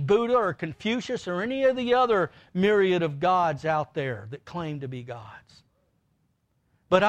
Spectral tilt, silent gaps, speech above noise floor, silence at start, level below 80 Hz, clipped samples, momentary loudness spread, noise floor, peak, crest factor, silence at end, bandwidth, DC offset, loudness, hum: -6.5 dB/octave; none; 45 dB; 0 s; -62 dBFS; under 0.1%; 14 LU; -71 dBFS; -6 dBFS; 20 dB; 0 s; 9 kHz; under 0.1%; -25 LUFS; none